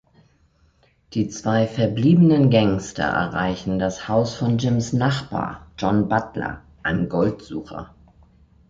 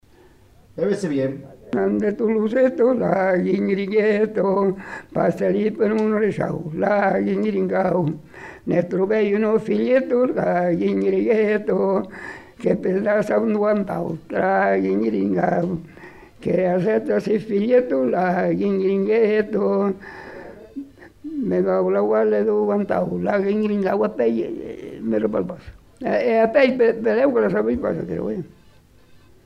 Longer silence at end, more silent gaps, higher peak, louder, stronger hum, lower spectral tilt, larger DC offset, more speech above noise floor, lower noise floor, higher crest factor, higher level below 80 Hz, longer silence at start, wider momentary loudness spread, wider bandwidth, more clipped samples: second, 0.85 s vs 1 s; neither; about the same, -4 dBFS vs -4 dBFS; about the same, -21 LUFS vs -20 LUFS; neither; second, -7 dB/octave vs -8.5 dB/octave; neither; first, 39 dB vs 31 dB; first, -59 dBFS vs -51 dBFS; about the same, 16 dB vs 16 dB; first, -46 dBFS vs -54 dBFS; first, 1.1 s vs 0.75 s; about the same, 14 LU vs 13 LU; second, 7.8 kHz vs 9.8 kHz; neither